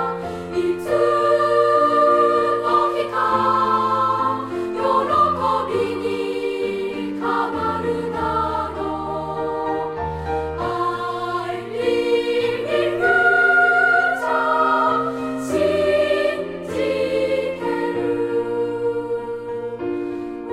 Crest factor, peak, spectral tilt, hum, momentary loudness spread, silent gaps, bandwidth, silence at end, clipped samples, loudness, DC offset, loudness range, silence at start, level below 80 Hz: 14 dB; -6 dBFS; -5.5 dB/octave; none; 11 LU; none; 14 kHz; 0 s; under 0.1%; -20 LUFS; under 0.1%; 7 LU; 0 s; -48 dBFS